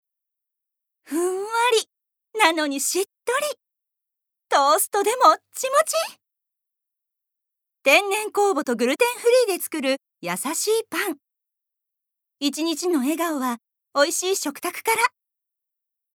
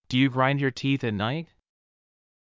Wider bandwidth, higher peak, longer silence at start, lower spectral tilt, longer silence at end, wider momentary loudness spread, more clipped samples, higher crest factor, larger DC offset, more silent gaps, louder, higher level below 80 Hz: first, over 20 kHz vs 7.6 kHz; first, -2 dBFS vs -10 dBFS; first, 1.1 s vs 0.1 s; second, -1.5 dB/octave vs -6.5 dB/octave; about the same, 1.05 s vs 1 s; first, 11 LU vs 7 LU; neither; about the same, 22 dB vs 18 dB; neither; neither; first, -22 LUFS vs -25 LUFS; second, under -90 dBFS vs -58 dBFS